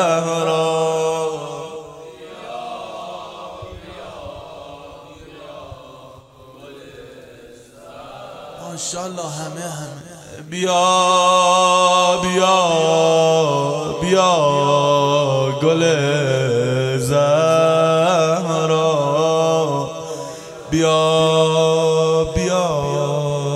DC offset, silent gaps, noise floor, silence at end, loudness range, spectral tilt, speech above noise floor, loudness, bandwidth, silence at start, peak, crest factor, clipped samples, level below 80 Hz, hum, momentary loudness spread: under 0.1%; none; -43 dBFS; 0 s; 19 LU; -4.5 dB/octave; 26 dB; -16 LUFS; 13.5 kHz; 0 s; -2 dBFS; 16 dB; under 0.1%; -48 dBFS; none; 21 LU